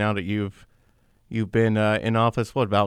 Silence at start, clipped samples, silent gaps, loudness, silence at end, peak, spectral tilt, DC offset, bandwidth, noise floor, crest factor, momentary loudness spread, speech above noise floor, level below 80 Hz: 0 s; under 0.1%; none; -24 LUFS; 0 s; -6 dBFS; -7 dB/octave; under 0.1%; 11 kHz; -61 dBFS; 16 dB; 9 LU; 38 dB; -54 dBFS